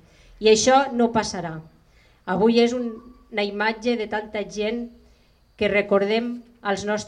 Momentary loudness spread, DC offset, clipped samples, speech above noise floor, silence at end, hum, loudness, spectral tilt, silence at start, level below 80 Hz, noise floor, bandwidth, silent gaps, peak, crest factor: 14 LU; under 0.1%; under 0.1%; 36 dB; 0 s; none; -22 LUFS; -4 dB/octave; 0.4 s; -54 dBFS; -57 dBFS; 10.5 kHz; none; -4 dBFS; 18 dB